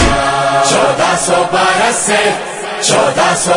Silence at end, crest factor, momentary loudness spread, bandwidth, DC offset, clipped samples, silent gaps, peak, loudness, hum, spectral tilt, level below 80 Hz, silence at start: 0 s; 12 dB; 4 LU; 11 kHz; under 0.1%; under 0.1%; none; 0 dBFS; -11 LUFS; none; -2.5 dB/octave; -30 dBFS; 0 s